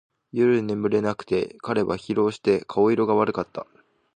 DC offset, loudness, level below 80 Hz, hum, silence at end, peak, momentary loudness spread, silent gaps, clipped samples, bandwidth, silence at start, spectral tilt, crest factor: under 0.1%; -23 LUFS; -58 dBFS; none; 0.55 s; -8 dBFS; 8 LU; none; under 0.1%; 9.4 kHz; 0.35 s; -7.5 dB/octave; 16 dB